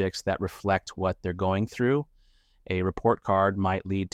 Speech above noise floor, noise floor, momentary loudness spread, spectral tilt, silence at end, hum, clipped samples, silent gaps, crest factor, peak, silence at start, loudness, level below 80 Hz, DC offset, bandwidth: 35 dB; -61 dBFS; 6 LU; -6.5 dB/octave; 0.05 s; none; under 0.1%; none; 18 dB; -10 dBFS; 0 s; -27 LUFS; -52 dBFS; under 0.1%; 15 kHz